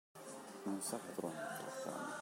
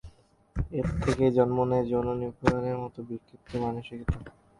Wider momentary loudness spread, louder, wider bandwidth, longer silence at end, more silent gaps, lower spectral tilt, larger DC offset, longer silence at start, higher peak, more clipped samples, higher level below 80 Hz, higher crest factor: second, 9 LU vs 13 LU; second, -45 LUFS vs -29 LUFS; first, 16 kHz vs 11.5 kHz; second, 0 s vs 0.3 s; neither; second, -3.5 dB/octave vs -8 dB/octave; neither; about the same, 0.15 s vs 0.05 s; second, -28 dBFS vs -8 dBFS; neither; second, under -90 dBFS vs -42 dBFS; about the same, 18 dB vs 22 dB